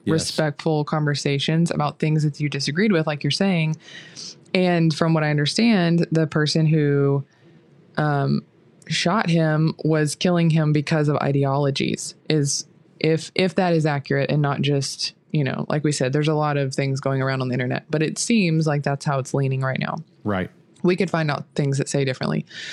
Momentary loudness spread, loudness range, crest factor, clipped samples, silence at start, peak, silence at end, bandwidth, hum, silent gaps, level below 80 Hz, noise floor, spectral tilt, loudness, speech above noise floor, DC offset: 7 LU; 3 LU; 20 dB; under 0.1%; 0.05 s; -2 dBFS; 0 s; 12 kHz; none; none; -62 dBFS; -52 dBFS; -5.5 dB/octave; -21 LUFS; 31 dB; under 0.1%